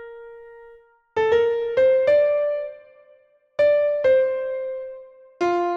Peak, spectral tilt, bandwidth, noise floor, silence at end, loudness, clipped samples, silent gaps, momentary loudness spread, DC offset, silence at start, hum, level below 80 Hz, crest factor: -8 dBFS; -5.5 dB/octave; 7.2 kHz; -56 dBFS; 0 s; -21 LUFS; under 0.1%; none; 19 LU; under 0.1%; 0 s; none; -60 dBFS; 14 dB